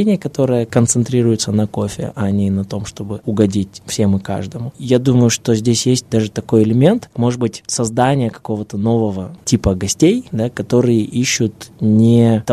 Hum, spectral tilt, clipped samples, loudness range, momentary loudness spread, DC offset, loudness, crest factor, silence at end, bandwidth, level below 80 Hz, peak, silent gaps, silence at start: none; -5.5 dB/octave; under 0.1%; 3 LU; 10 LU; under 0.1%; -16 LUFS; 16 dB; 0 s; 14 kHz; -42 dBFS; 0 dBFS; none; 0 s